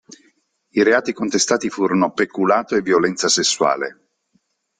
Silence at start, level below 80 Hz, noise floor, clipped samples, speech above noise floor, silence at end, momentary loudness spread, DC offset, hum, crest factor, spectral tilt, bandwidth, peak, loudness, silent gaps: 0.75 s; -62 dBFS; -66 dBFS; under 0.1%; 48 dB; 0.9 s; 5 LU; under 0.1%; none; 18 dB; -3 dB/octave; 10 kHz; -2 dBFS; -18 LUFS; none